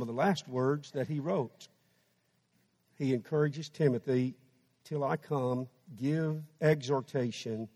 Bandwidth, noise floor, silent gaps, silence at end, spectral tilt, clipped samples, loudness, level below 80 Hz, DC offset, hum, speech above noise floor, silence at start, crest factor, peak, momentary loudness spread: 13.5 kHz; -74 dBFS; none; 0.05 s; -7 dB/octave; under 0.1%; -33 LUFS; -76 dBFS; under 0.1%; none; 42 dB; 0 s; 18 dB; -14 dBFS; 8 LU